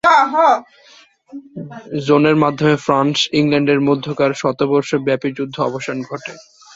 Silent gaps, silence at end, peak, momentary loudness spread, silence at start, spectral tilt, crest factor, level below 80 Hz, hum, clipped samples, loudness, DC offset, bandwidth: none; 0.35 s; 0 dBFS; 19 LU; 0.05 s; -5.5 dB/octave; 16 dB; -56 dBFS; none; under 0.1%; -16 LUFS; under 0.1%; 7.8 kHz